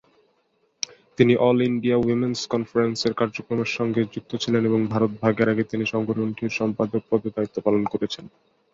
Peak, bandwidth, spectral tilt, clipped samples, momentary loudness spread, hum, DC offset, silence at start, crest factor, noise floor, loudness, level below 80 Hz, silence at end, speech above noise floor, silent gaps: -2 dBFS; 7.8 kHz; -6 dB/octave; under 0.1%; 9 LU; none; under 0.1%; 1.2 s; 20 dB; -67 dBFS; -23 LUFS; -60 dBFS; 0.45 s; 45 dB; none